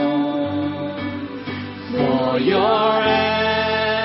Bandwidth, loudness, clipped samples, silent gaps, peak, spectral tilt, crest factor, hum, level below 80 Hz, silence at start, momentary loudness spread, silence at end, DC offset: 5.8 kHz; -20 LUFS; under 0.1%; none; -4 dBFS; -3 dB/octave; 14 dB; none; -52 dBFS; 0 s; 12 LU; 0 s; under 0.1%